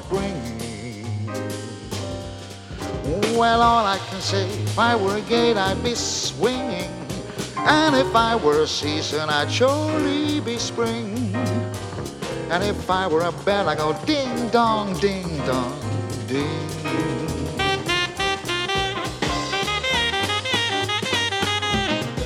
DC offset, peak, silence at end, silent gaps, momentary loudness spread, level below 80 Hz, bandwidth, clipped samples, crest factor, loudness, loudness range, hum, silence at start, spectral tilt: under 0.1%; -2 dBFS; 0 s; none; 11 LU; -42 dBFS; 16.5 kHz; under 0.1%; 20 dB; -22 LUFS; 4 LU; none; 0 s; -4 dB/octave